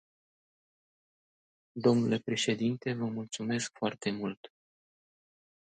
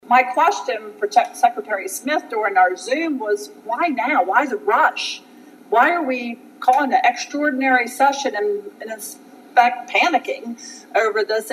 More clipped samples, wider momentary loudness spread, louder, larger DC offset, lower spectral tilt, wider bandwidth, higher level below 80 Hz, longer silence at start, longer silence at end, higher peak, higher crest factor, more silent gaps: neither; about the same, 10 LU vs 12 LU; second, -32 LUFS vs -19 LUFS; neither; first, -5 dB/octave vs -1.5 dB/octave; second, 9.4 kHz vs 16 kHz; first, -76 dBFS vs -84 dBFS; first, 1.75 s vs 0.05 s; first, 1.3 s vs 0 s; second, -14 dBFS vs 0 dBFS; about the same, 22 dB vs 20 dB; first, 4.37-4.43 s vs none